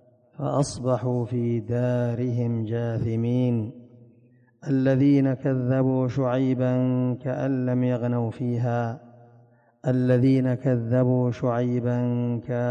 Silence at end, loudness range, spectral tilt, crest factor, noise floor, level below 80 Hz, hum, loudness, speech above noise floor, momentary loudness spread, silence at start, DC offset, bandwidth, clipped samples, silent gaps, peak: 0 s; 3 LU; -8.5 dB/octave; 14 dB; -57 dBFS; -56 dBFS; none; -24 LUFS; 34 dB; 7 LU; 0.4 s; under 0.1%; 9.6 kHz; under 0.1%; none; -10 dBFS